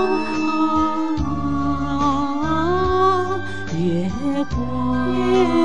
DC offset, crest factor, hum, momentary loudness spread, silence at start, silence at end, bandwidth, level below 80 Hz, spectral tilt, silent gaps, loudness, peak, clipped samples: 3%; 14 dB; none; 6 LU; 0 s; 0 s; 10 kHz; -34 dBFS; -7 dB/octave; none; -20 LUFS; -6 dBFS; under 0.1%